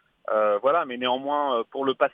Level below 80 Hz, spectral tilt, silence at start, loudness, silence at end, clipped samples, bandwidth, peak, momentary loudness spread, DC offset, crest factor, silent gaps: -76 dBFS; -6.5 dB/octave; 0.3 s; -24 LUFS; 0.05 s; under 0.1%; 4.8 kHz; -8 dBFS; 5 LU; under 0.1%; 18 dB; none